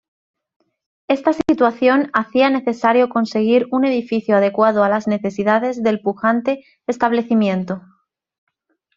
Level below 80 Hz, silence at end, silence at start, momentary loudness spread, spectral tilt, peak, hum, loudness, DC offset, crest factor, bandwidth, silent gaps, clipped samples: -60 dBFS; 1.2 s; 1.1 s; 6 LU; -6.5 dB/octave; -2 dBFS; none; -17 LUFS; under 0.1%; 16 dB; 7.4 kHz; none; under 0.1%